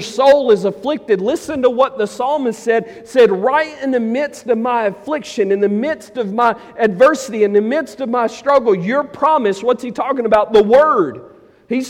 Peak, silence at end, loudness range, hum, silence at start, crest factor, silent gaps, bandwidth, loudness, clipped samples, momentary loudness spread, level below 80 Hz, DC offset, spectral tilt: -2 dBFS; 0 s; 2 LU; none; 0 s; 14 dB; none; 14 kHz; -15 LUFS; under 0.1%; 8 LU; -54 dBFS; under 0.1%; -5.5 dB/octave